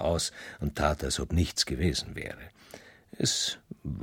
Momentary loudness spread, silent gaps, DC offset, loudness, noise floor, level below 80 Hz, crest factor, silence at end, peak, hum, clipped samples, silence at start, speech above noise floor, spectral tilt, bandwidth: 20 LU; none; under 0.1%; -30 LUFS; -52 dBFS; -42 dBFS; 20 dB; 0 s; -12 dBFS; none; under 0.1%; 0 s; 21 dB; -4 dB/octave; 17 kHz